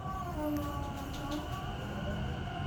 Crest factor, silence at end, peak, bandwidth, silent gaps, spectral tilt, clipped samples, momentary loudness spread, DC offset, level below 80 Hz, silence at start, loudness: 14 dB; 0 s; -22 dBFS; over 20 kHz; none; -6 dB/octave; under 0.1%; 4 LU; under 0.1%; -46 dBFS; 0 s; -38 LUFS